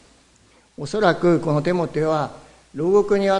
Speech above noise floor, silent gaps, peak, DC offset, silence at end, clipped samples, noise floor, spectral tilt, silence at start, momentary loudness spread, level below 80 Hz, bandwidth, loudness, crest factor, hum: 36 dB; none; -2 dBFS; under 0.1%; 0 s; under 0.1%; -55 dBFS; -7 dB/octave; 0.8 s; 12 LU; -52 dBFS; 10.5 kHz; -20 LUFS; 20 dB; none